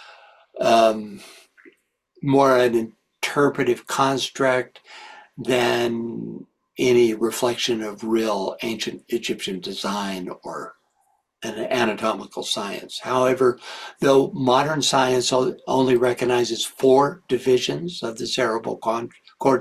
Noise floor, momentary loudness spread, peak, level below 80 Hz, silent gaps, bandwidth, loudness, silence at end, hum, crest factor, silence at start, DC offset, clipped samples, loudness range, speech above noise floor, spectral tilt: -67 dBFS; 16 LU; -4 dBFS; -62 dBFS; none; 14 kHz; -21 LUFS; 0 s; none; 18 dB; 0 s; under 0.1%; under 0.1%; 7 LU; 46 dB; -4.5 dB/octave